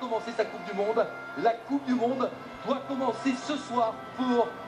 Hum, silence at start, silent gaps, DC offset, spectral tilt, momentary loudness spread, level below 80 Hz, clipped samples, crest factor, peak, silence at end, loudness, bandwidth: none; 0 s; none; under 0.1%; -5 dB/octave; 5 LU; -70 dBFS; under 0.1%; 18 dB; -12 dBFS; 0 s; -30 LUFS; 10.5 kHz